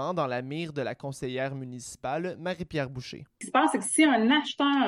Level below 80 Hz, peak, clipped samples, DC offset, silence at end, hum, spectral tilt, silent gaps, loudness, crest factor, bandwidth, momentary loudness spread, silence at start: -62 dBFS; -10 dBFS; under 0.1%; under 0.1%; 0 s; none; -4 dB/octave; none; -28 LUFS; 18 dB; 12 kHz; 15 LU; 0 s